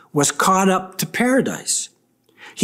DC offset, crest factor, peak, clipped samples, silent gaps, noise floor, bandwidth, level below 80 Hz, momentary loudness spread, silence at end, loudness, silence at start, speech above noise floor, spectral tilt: under 0.1%; 16 dB; -4 dBFS; under 0.1%; none; -55 dBFS; 16 kHz; -60 dBFS; 10 LU; 0 s; -18 LUFS; 0.15 s; 37 dB; -3.5 dB/octave